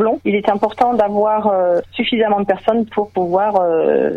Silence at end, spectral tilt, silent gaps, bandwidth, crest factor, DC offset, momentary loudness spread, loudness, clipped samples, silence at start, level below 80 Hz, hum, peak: 0 s; -7.5 dB/octave; none; 7.2 kHz; 14 dB; under 0.1%; 3 LU; -16 LUFS; under 0.1%; 0 s; -52 dBFS; none; -2 dBFS